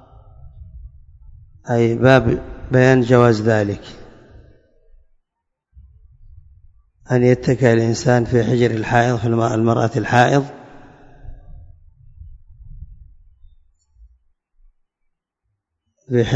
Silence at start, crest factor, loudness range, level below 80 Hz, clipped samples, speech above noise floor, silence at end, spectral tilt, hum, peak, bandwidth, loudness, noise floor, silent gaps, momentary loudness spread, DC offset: 0.45 s; 20 dB; 9 LU; -42 dBFS; under 0.1%; 62 dB; 0 s; -7 dB/octave; none; 0 dBFS; 7.8 kHz; -16 LUFS; -77 dBFS; none; 9 LU; under 0.1%